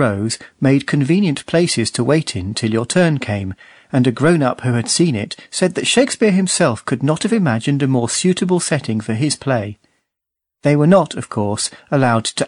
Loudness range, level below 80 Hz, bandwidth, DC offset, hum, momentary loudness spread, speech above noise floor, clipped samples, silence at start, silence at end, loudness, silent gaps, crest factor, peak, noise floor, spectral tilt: 2 LU; -54 dBFS; 11 kHz; under 0.1%; none; 7 LU; 66 dB; under 0.1%; 0 s; 0 s; -17 LUFS; none; 16 dB; -2 dBFS; -82 dBFS; -5 dB/octave